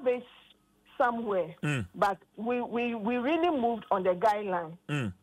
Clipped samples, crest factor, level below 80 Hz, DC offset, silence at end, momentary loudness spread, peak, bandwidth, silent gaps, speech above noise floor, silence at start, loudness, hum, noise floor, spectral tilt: under 0.1%; 16 dB; -66 dBFS; under 0.1%; 0.1 s; 7 LU; -14 dBFS; 15.5 kHz; none; 32 dB; 0 s; -30 LUFS; none; -62 dBFS; -6.5 dB/octave